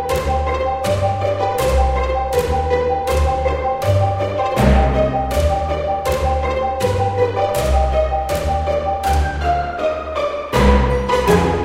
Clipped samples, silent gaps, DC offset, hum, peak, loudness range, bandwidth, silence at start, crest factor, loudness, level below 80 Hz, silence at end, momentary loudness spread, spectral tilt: under 0.1%; none; under 0.1%; none; -2 dBFS; 1 LU; 16.5 kHz; 0 s; 16 dB; -18 LUFS; -22 dBFS; 0 s; 5 LU; -6 dB/octave